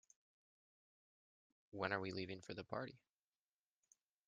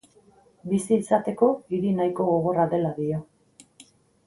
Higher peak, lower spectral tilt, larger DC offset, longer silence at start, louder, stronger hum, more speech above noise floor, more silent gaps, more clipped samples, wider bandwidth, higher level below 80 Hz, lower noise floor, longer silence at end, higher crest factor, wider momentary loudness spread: second, -24 dBFS vs -6 dBFS; second, -3.5 dB/octave vs -7.5 dB/octave; neither; first, 1.75 s vs 0.65 s; second, -47 LUFS vs -24 LUFS; neither; first, over 44 dB vs 34 dB; neither; neither; second, 7.4 kHz vs 11.5 kHz; second, -84 dBFS vs -62 dBFS; first, under -90 dBFS vs -57 dBFS; first, 1.3 s vs 1.05 s; first, 28 dB vs 18 dB; first, 10 LU vs 7 LU